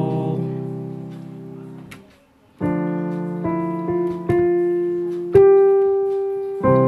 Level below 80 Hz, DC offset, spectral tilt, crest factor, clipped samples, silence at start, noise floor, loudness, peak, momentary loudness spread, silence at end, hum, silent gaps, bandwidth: -52 dBFS; under 0.1%; -10 dB/octave; 18 dB; under 0.1%; 0 s; -53 dBFS; -19 LUFS; -2 dBFS; 21 LU; 0 s; none; none; 4.1 kHz